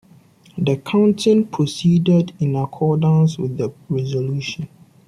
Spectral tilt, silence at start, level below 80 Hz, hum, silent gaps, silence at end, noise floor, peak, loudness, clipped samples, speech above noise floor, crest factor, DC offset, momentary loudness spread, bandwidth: -7.5 dB/octave; 0.55 s; -56 dBFS; none; none; 0.4 s; -49 dBFS; -4 dBFS; -18 LUFS; under 0.1%; 32 dB; 14 dB; under 0.1%; 10 LU; 11 kHz